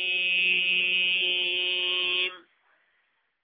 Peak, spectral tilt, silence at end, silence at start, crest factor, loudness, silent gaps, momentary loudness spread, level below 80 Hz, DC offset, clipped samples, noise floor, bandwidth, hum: -14 dBFS; -3.5 dB/octave; 1.05 s; 0 s; 14 dB; -23 LUFS; none; 4 LU; -86 dBFS; under 0.1%; under 0.1%; -72 dBFS; 5.2 kHz; none